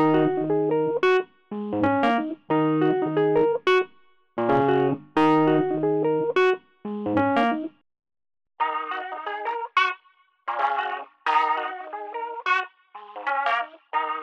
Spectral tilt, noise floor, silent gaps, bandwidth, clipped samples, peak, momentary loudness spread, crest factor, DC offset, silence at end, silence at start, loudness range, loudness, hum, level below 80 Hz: -7 dB/octave; -61 dBFS; none; 7.4 kHz; under 0.1%; -8 dBFS; 12 LU; 16 dB; under 0.1%; 0 s; 0 s; 5 LU; -24 LUFS; none; -64 dBFS